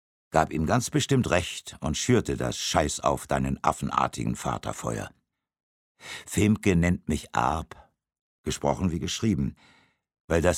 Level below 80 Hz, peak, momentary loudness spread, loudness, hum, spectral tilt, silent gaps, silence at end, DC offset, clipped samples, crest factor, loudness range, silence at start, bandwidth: -44 dBFS; -6 dBFS; 10 LU; -27 LUFS; none; -5 dB/octave; 5.63-5.95 s, 8.21-8.44 s, 10.21-10.28 s; 0 s; under 0.1%; under 0.1%; 22 dB; 4 LU; 0.3 s; 16.5 kHz